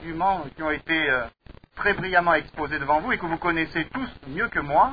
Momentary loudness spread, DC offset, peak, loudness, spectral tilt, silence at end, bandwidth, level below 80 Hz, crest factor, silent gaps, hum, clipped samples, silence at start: 8 LU; 0.3%; -6 dBFS; -24 LUFS; -8 dB/octave; 0 s; 5 kHz; -48 dBFS; 18 dB; none; none; under 0.1%; 0 s